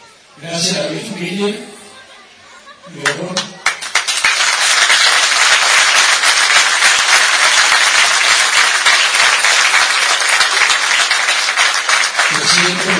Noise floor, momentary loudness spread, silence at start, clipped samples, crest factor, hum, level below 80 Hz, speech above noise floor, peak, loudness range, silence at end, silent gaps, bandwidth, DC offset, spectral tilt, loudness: -40 dBFS; 11 LU; 0.4 s; under 0.1%; 14 dB; none; -60 dBFS; 21 dB; 0 dBFS; 12 LU; 0 s; none; 11 kHz; under 0.1%; 0 dB/octave; -10 LUFS